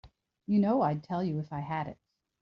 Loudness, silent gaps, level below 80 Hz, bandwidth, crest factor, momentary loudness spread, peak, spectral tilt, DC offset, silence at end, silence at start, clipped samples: -31 LUFS; none; -66 dBFS; 5.8 kHz; 14 dB; 11 LU; -16 dBFS; -8 dB/octave; under 0.1%; 0.5 s; 0.05 s; under 0.1%